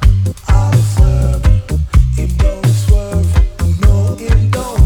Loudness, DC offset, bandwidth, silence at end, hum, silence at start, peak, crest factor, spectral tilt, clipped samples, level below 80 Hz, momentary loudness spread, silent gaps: -13 LUFS; under 0.1%; 15.5 kHz; 0 s; none; 0 s; 0 dBFS; 10 dB; -6.5 dB/octave; 0.5%; -14 dBFS; 4 LU; none